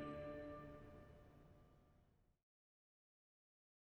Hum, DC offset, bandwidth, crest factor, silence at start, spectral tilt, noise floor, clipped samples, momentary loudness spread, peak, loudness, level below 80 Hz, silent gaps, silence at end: none; under 0.1%; 8.2 kHz; 18 dB; 0 s; -8 dB/octave; -76 dBFS; under 0.1%; 16 LU; -40 dBFS; -56 LUFS; -72 dBFS; none; 1.6 s